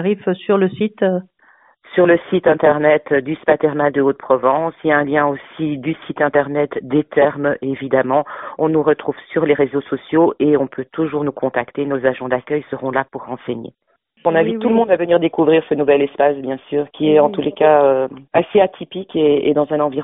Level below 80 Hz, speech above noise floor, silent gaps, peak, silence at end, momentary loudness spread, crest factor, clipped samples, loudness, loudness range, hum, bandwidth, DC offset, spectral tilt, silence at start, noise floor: -58 dBFS; 36 dB; none; 0 dBFS; 0 s; 9 LU; 16 dB; under 0.1%; -17 LUFS; 4 LU; none; 3.9 kHz; under 0.1%; -5 dB/octave; 0 s; -53 dBFS